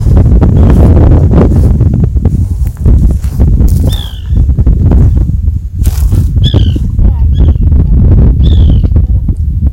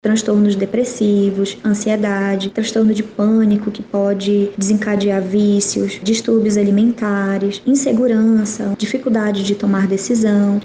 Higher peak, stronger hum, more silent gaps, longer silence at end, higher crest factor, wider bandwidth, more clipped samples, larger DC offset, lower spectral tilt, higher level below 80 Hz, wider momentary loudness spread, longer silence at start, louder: first, 0 dBFS vs -6 dBFS; neither; neither; about the same, 0 s vs 0 s; about the same, 6 dB vs 10 dB; first, 16 kHz vs 9.8 kHz; first, 3% vs under 0.1%; neither; first, -8.5 dB/octave vs -5.5 dB/octave; first, -8 dBFS vs -54 dBFS; about the same, 6 LU vs 5 LU; about the same, 0 s vs 0.05 s; first, -8 LUFS vs -16 LUFS